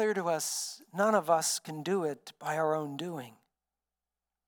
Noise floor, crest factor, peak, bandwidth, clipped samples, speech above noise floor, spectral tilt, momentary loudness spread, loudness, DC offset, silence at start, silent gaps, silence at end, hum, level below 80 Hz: under -90 dBFS; 20 dB; -12 dBFS; 19 kHz; under 0.1%; over 58 dB; -3.5 dB/octave; 12 LU; -32 LUFS; under 0.1%; 0 s; none; 1.2 s; none; under -90 dBFS